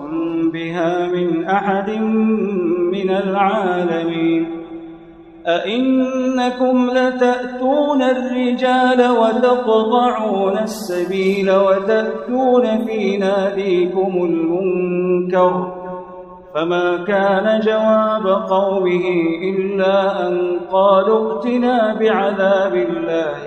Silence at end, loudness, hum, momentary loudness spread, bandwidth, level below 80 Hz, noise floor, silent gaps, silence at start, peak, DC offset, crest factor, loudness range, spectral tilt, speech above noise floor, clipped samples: 0 s; -17 LUFS; none; 6 LU; 12 kHz; -56 dBFS; -40 dBFS; none; 0 s; -2 dBFS; under 0.1%; 14 dB; 3 LU; -6.5 dB/octave; 24 dB; under 0.1%